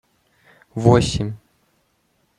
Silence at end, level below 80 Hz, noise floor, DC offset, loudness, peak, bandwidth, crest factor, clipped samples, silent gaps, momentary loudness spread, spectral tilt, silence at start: 1 s; -42 dBFS; -65 dBFS; under 0.1%; -18 LUFS; -2 dBFS; 11 kHz; 22 dB; under 0.1%; none; 19 LU; -6.5 dB/octave; 0.75 s